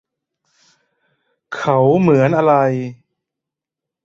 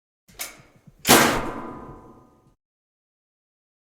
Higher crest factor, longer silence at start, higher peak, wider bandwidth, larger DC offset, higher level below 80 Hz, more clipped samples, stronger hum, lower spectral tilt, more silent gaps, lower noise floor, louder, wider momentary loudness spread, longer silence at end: second, 18 dB vs 26 dB; first, 1.5 s vs 0.4 s; about the same, 0 dBFS vs 0 dBFS; second, 7.6 kHz vs over 20 kHz; neither; second, -58 dBFS vs -48 dBFS; neither; neither; first, -8.5 dB/octave vs -2.5 dB/octave; neither; first, -85 dBFS vs -52 dBFS; first, -14 LUFS vs -18 LUFS; second, 14 LU vs 22 LU; second, 1.1 s vs 1.95 s